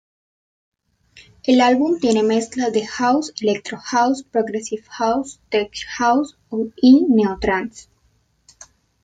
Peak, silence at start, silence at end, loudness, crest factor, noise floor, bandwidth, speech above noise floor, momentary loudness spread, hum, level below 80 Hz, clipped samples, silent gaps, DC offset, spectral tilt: -2 dBFS; 1.45 s; 1.2 s; -19 LUFS; 16 dB; -62 dBFS; 9.2 kHz; 44 dB; 13 LU; none; -50 dBFS; under 0.1%; none; under 0.1%; -4.5 dB/octave